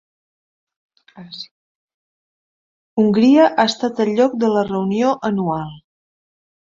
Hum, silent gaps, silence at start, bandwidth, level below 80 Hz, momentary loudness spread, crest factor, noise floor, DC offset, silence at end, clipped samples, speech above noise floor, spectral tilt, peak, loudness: none; 1.51-1.88 s, 1.94-2.97 s; 1.15 s; 7.6 kHz; -60 dBFS; 21 LU; 18 dB; under -90 dBFS; under 0.1%; 0.9 s; under 0.1%; over 74 dB; -6 dB/octave; -2 dBFS; -17 LUFS